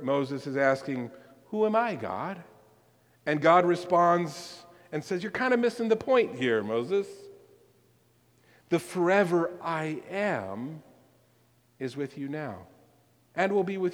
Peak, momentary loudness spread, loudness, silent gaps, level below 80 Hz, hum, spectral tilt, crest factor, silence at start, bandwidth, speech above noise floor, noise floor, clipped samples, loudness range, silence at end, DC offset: -8 dBFS; 16 LU; -28 LUFS; none; -74 dBFS; none; -6 dB/octave; 22 dB; 0 s; 16 kHz; 38 dB; -65 dBFS; under 0.1%; 8 LU; 0 s; under 0.1%